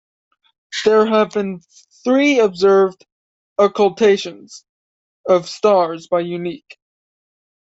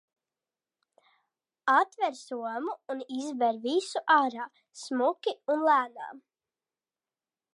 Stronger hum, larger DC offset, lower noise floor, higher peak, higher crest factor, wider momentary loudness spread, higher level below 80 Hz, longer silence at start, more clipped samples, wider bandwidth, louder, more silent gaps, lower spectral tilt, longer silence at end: neither; neither; about the same, under -90 dBFS vs under -90 dBFS; first, -2 dBFS vs -10 dBFS; about the same, 16 dB vs 20 dB; about the same, 14 LU vs 14 LU; first, -64 dBFS vs under -90 dBFS; second, 0.7 s vs 1.65 s; neither; second, 8 kHz vs 11.5 kHz; first, -16 LUFS vs -29 LUFS; first, 3.12-3.56 s, 4.69-5.24 s vs none; first, -5 dB/octave vs -2.5 dB/octave; second, 1.2 s vs 1.35 s